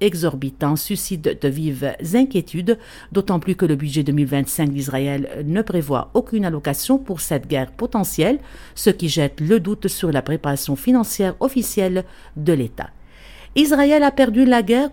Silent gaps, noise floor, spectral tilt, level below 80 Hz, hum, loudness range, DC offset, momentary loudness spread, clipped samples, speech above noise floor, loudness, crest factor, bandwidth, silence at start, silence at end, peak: none; -41 dBFS; -5.5 dB/octave; -44 dBFS; none; 2 LU; under 0.1%; 9 LU; under 0.1%; 22 dB; -19 LUFS; 18 dB; 17.5 kHz; 0 s; 0 s; 0 dBFS